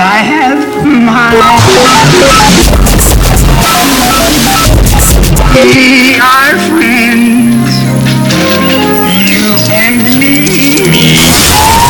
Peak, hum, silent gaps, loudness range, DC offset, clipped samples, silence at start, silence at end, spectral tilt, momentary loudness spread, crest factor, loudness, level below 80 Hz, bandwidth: 0 dBFS; none; none; 2 LU; under 0.1%; 4%; 0 s; 0 s; -4 dB/octave; 4 LU; 4 dB; -5 LUFS; -14 dBFS; over 20 kHz